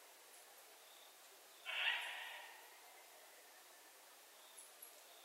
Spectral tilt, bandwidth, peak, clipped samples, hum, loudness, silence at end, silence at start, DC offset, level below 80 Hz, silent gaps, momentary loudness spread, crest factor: 3 dB/octave; 16 kHz; -26 dBFS; under 0.1%; none; -45 LUFS; 0 s; 0 s; under 0.1%; under -90 dBFS; none; 21 LU; 26 dB